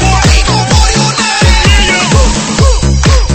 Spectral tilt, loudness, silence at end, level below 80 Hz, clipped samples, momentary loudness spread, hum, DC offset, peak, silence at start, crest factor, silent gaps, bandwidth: -4 dB/octave; -8 LUFS; 0 s; -10 dBFS; 1%; 3 LU; none; under 0.1%; 0 dBFS; 0 s; 8 dB; none; 9.2 kHz